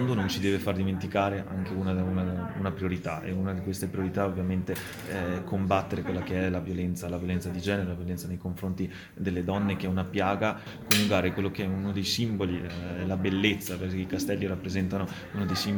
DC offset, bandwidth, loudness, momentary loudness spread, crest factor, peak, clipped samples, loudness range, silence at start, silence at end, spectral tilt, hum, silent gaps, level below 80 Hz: under 0.1%; 19 kHz; -30 LUFS; 7 LU; 24 dB; -6 dBFS; under 0.1%; 4 LU; 0 s; 0 s; -5.5 dB/octave; none; none; -54 dBFS